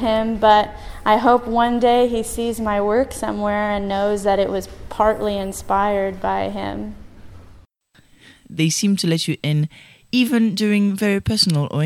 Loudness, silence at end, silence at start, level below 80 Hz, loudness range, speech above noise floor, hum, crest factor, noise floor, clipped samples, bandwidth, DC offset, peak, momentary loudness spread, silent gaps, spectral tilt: -19 LUFS; 0 s; 0 s; -40 dBFS; 6 LU; 36 dB; none; 18 dB; -54 dBFS; under 0.1%; 16.5 kHz; under 0.1%; -2 dBFS; 9 LU; none; -5 dB/octave